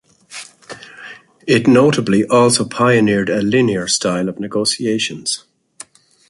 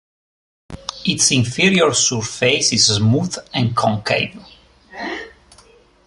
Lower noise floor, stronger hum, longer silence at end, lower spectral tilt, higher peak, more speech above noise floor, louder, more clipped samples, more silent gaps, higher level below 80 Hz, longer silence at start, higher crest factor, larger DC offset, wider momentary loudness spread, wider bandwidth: second, -41 dBFS vs -50 dBFS; neither; about the same, 0.9 s vs 0.8 s; first, -4.5 dB/octave vs -3 dB/octave; about the same, -2 dBFS vs 0 dBFS; second, 27 dB vs 33 dB; about the same, -15 LUFS vs -16 LUFS; neither; neither; about the same, -52 dBFS vs -48 dBFS; second, 0.3 s vs 0.7 s; about the same, 16 dB vs 18 dB; neither; first, 22 LU vs 15 LU; about the same, 12 kHz vs 11.5 kHz